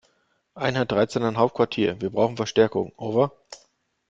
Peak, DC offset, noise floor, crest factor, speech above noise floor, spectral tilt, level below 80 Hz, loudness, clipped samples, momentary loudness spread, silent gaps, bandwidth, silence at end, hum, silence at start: -4 dBFS; under 0.1%; -68 dBFS; 20 dB; 45 dB; -6 dB/octave; -60 dBFS; -24 LUFS; under 0.1%; 5 LU; none; 7.8 kHz; 0.55 s; none; 0.55 s